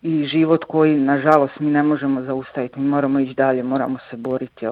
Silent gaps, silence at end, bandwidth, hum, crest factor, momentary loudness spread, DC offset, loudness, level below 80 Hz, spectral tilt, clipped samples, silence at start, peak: none; 0 s; 5.2 kHz; none; 18 dB; 10 LU; under 0.1%; -19 LUFS; -62 dBFS; -9 dB/octave; under 0.1%; 0.05 s; -2 dBFS